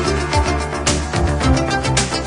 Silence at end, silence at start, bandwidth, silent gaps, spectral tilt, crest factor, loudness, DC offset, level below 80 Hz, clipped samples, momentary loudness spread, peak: 0 s; 0 s; 11 kHz; none; -4.5 dB/octave; 16 dB; -18 LUFS; under 0.1%; -24 dBFS; under 0.1%; 3 LU; -2 dBFS